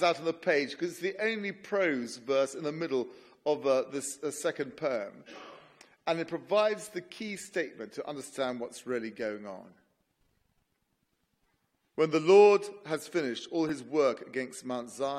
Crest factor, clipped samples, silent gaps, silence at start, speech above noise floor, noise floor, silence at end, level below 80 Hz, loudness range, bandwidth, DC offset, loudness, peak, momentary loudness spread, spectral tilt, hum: 22 dB; under 0.1%; none; 0 s; 47 dB; -78 dBFS; 0 s; -78 dBFS; 12 LU; 14 kHz; under 0.1%; -31 LUFS; -10 dBFS; 12 LU; -4.5 dB/octave; none